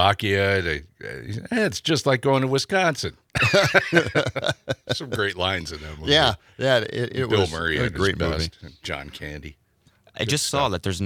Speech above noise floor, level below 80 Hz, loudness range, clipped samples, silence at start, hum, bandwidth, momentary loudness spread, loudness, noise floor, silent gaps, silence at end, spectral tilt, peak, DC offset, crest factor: 36 dB; -46 dBFS; 5 LU; under 0.1%; 0 s; none; 17.5 kHz; 14 LU; -22 LUFS; -59 dBFS; none; 0 s; -4 dB/octave; 0 dBFS; under 0.1%; 22 dB